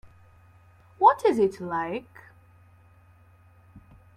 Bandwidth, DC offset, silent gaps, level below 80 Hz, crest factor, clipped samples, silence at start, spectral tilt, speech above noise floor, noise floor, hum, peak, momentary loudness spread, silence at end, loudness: 14 kHz; under 0.1%; none; -64 dBFS; 24 dB; under 0.1%; 1 s; -6.5 dB/octave; 30 dB; -56 dBFS; none; -4 dBFS; 13 LU; 0.35 s; -24 LUFS